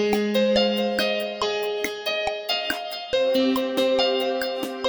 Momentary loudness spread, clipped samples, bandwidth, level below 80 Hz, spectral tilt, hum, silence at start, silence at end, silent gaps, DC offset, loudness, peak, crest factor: 6 LU; under 0.1%; over 20 kHz; -56 dBFS; -4 dB/octave; none; 0 s; 0 s; none; under 0.1%; -23 LUFS; -6 dBFS; 16 dB